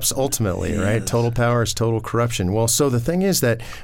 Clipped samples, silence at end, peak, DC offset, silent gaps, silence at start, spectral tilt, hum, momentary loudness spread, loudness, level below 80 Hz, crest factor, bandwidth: under 0.1%; 0 s; -6 dBFS; under 0.1%; none; 0 s; -4.5 dB/octave; none; 4 LU; -20 LUFS; -38 dBFS; 14 dB; 17 kHz